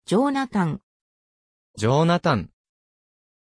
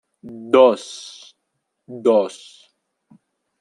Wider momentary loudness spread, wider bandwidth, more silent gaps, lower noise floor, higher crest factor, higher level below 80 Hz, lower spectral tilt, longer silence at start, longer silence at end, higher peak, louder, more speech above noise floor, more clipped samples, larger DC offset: second, 11 LU vs 25 LU; about the same, 10.5 kHz vs 11 kHz; first, 0.83-1.74 s vs none; first, under -90 dBFS vs -75 dBFS; about the same, 16 dB vs 20 dB; first, -56 dBFS vs -72 dBFS; first, -6.5 dB/octave vs -4.5 dB/octave; second, 0.1 s vs 0.25 s; second, 0.95 s vs 1.35 s; second, -8 dBFS vs -2 dBFS; second, -22 LUFS vs -17 LUFS; first, over 69 dB vs 57 dB; neither; neither